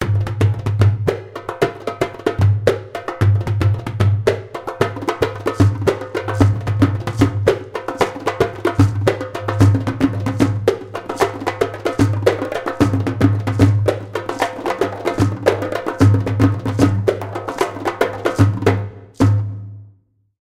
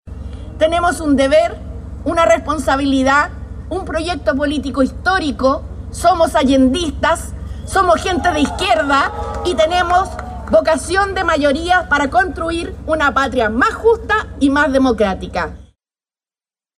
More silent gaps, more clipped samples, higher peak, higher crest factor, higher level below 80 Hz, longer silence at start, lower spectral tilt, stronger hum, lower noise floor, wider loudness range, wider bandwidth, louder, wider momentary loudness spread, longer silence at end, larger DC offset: neither; neither; about the same, 0 dBFS vs -2 dBFS; about the same, 16 dB vs 14 dB; second, -40 dBFS vs -32 dBFS; about the same, 0 s vs 0.05 s; first, -7.5 dB/octave vs -5 dB/octave; neither; second, -54 dBFS vs under -90 dBFS; about the same, 1 LU vs 2 LU; about the same, 13.5 kHz vs 14 kHz; second, -18 LUFS vs -15 LUFS; about the same, 8 LU vs 10 LU; second, 0.55 s vs 1.15 s; neither